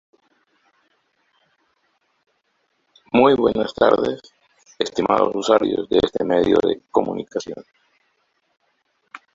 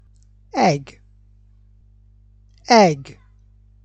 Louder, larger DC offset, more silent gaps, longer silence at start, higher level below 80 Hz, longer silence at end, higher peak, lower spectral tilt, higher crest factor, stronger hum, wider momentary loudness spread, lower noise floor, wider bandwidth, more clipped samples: about the same, -19 LUFS vs -17 LUFS; neither; neither; first, 3.15 s vs 0.55 s; about the same, -54 dBFS vs -52 dBFS; second, 0.2 s vs 0.8 s; about the same, -2 dBFS vs -2 dBFS; about the same, -5.5 dB/octave vs -5 dB/octave; about the same, 20 dB vs 20 dB; second, none vs 50 Hz at -50 dBFS; second, 13 LU vs 16 LU; first, -69 dBFS vs -51 dBFS; second, 7.8 kHz vs 8.6 kHz; neither